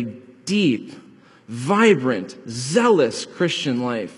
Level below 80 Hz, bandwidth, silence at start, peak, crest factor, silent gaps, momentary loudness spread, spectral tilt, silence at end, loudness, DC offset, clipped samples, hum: -68 dBFS; 11.5 kHz; 0 s; -2 dBFS; 18 dB; none; 16 LU; -5 dB/octave; 0.05 s; -20 LUFS; under 0.1%; under 0.1%; none